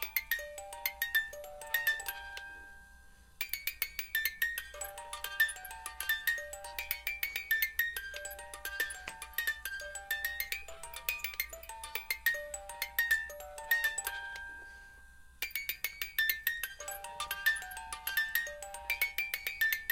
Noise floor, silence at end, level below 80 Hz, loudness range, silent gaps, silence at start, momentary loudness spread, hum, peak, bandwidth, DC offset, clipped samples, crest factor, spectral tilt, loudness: -57 dBFS; 0 s; -60 dBFS; 3 LU; none; 0 s; 12 LU; none; -12 dBFS; 17 kHz; under 0.1%; under 0.1%; 26 dB; 1 dB/octave; -35 LUFS